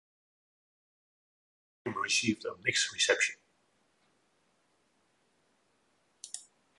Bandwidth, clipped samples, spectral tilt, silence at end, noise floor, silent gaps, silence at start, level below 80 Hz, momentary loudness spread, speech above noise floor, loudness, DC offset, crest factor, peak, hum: 11.5 kHz; under 0.1%; -1.5 dB/octave; 0.35 s; -73 dBFS; none; 1.85 s; -76 dBFS; 18 LU; 42 dB; -30 LUFS; under 0.1%; 26 dB; -12 dBFS; none